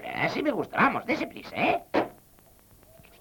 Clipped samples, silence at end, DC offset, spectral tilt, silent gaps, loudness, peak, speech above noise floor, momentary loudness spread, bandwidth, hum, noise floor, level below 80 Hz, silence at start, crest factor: under 0.1%; 1.05 s; under 0.1%; -6 dB/octave; none; -27 LUFS; -10 dBFS; 30 dB; 6 LU; 19 kHz; none; -57 dBFS; -60 dBFS; 0 s; 18 dB